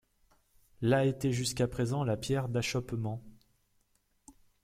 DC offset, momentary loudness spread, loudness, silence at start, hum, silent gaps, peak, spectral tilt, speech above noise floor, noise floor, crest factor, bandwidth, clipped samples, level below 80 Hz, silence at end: under 0.1%; 9 LU; -32 LUFS; 0.8 s; 50 Hz at -65 dBFS; none; -14 dBFS; -5.5 dB/octave; 42 dB; -73 dBFS; 20 dB; 15.5 kHz; under 0.1%; -58 dBFS; 0.3 s